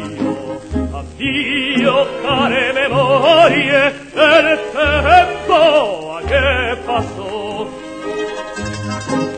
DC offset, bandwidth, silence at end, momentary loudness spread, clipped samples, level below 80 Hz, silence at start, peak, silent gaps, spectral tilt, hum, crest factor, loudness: under 0.1%; 9.2 kHz; 0 s; 14 LU; under 0.1%; -34 dBFS; 0 s; 0 dBFS; none; -5 dB/octave; none; 14 dB; -14 LUFS